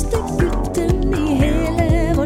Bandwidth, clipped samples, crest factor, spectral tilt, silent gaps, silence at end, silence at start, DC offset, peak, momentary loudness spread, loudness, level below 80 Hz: 15.5 kHz; under 0.1%; 14 dB; -7 dB/octave; none; 0 s; 0 s; under 0.1%; -4 dBFS; 3 LU; -18 LUFS; -22 dBFS